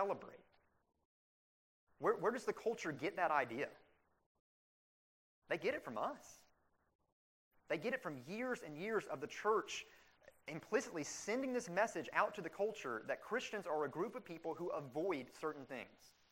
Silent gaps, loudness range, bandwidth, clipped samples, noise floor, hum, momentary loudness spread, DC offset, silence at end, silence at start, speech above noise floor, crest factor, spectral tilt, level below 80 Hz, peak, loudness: 1.05-1.87 s, 4.26-5.42 s, 6.95-6.99 s, 7.12-7.51 s; 6 LU; 16 kHz; under 0.1%; -77 dBFS; none; 10 LU; under 0.1%; 0.25 s; 0 s; 36 dB; 22 dB; -4 dB/octave; -82 dBFS; -20 dBFS; -42 LUFS